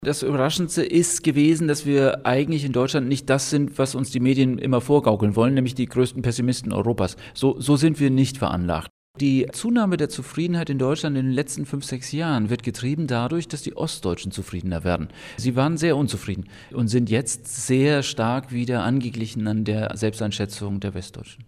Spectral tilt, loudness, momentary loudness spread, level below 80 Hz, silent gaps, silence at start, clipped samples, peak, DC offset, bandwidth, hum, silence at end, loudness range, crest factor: -5.5 dB/octave; -23 LUFS; 9 LU; -50 dBFS; 8.90-9.14 s; 0 s; under 0.1%; -4 dBFS; under 0.1%; 15.5 kHz; none; 0.05 s; 5 LU; 18 dB